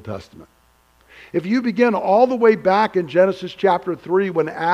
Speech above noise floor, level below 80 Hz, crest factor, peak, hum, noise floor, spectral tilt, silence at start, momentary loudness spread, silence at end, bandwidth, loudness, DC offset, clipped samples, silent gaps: 38 dB; -60 dBFS; 16 dB; -2 dBFS; none; -56 dBFS; -7 dB/octave; 0.05 s; 9 LU; 0 s; 10 kHz; -18 LUFS; under 0.1%; under 0.1%; none